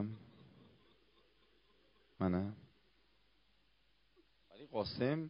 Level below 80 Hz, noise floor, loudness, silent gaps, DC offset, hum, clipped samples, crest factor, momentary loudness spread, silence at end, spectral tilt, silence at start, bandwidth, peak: -72 dBFS; -76 dBFS; -40 LUFS; none; under 0.1%; none; under 0.1%; 22 dB; 21 LU; 0 s; -6 dB/octave; 0 s; 5.2 kHz; -22 dBFS